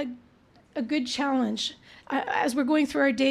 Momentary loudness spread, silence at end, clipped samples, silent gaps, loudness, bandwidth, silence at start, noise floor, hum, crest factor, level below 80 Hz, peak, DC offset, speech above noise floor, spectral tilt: 12 LU; 0 s; under 0.1%; none; -27 LUFS; 13 kHz; 0 s; -58 dBFS; none; 16 dB; -66 dBFS; -12 dBFS; under 0.1%; 31 dB; -3.5 dB/octave